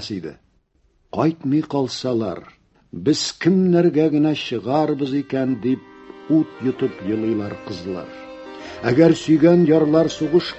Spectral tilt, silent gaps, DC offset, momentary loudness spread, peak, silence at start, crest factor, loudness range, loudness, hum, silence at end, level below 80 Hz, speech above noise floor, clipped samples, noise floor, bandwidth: -6.5 dB/octave; none; under 0.1%; 16 LU; -2 dBFS; 0 s; 18 dB; 6 LU; -19 LUFS; none; 0 s; -54 dBFS; 43 dB; under 0.1%; -61 dBFS; 8.2 kHz